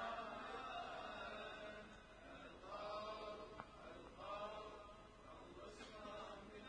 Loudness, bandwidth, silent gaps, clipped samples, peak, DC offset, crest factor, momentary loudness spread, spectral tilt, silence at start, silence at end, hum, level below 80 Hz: -53 LUFS; 10 kHz; none; under 0.1%; -34 dBFS; under 0.1%; 18 dB; 10 LU; -4 dB/octave; 0 s; 0 s; none; -70 dBFS